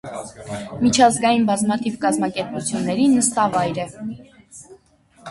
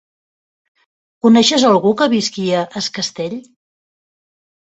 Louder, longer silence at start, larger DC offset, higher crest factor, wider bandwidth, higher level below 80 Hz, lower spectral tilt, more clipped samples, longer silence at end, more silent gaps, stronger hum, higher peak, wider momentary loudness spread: second, -19 LUFS vs -15 LUFS; second, 0.05 s vs 1.25 s; neither; about the same, 20 dB vs 16 dB; first, 11.5 kHz vs 8.2 kHz; first, -54 dBFS vs -60 dBFS; about the same, -4 dB/octave vs -4 dB/octave; neither; second, 0 s vs 1.25 s; neither; neither; about the same, 0 dBFS vs 0 dBFS; first, 18 LU vs 13 LU